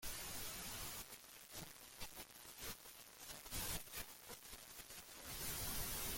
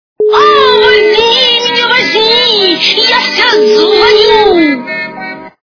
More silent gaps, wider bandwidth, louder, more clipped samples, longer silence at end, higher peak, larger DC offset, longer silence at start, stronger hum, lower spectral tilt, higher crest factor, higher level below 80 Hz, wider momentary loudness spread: neither; first, 17 kHz vs 5.4 kHz; second, -49 LUFS vs -6 LUFS; second, under 0.1% vs 2%; second, 0 s vs 0.2 s; second, -30 dBFS vs 0 dBFS; neither; second, 0 s vs 0.2 s; neither; about the same, -1.5 dB/octave vs -2.5 dB/octave; first, 18 dB vs 8 dB; second, -60 dBFS vs -42 dBFS; about the same, 11 LU vs 9 LU